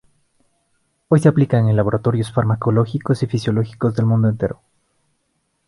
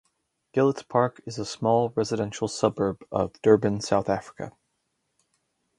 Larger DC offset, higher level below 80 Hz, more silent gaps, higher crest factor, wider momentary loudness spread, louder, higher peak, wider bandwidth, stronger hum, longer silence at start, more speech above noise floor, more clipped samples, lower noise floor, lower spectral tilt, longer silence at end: neither; first, -48 dBFS vs -58 dBFS; neither; about the same, 18 dB vs 22 dB; second, 6 LU vs 12 LU; first, -18 LUFS vs -25 LUFS; first, 0 dBFS vs -4 dBFS; about the same, 11.5 kHz vs 11.5 kHz; neither; first, 1.1 s vs 0.55 s; about the same, 52 dB vs 52 dB; neither; second, -69 dBFS vs -76 dBFS; first, -8.5 dB/octave vs -6 dB/octave; second, 1.15 s vs 1.3 s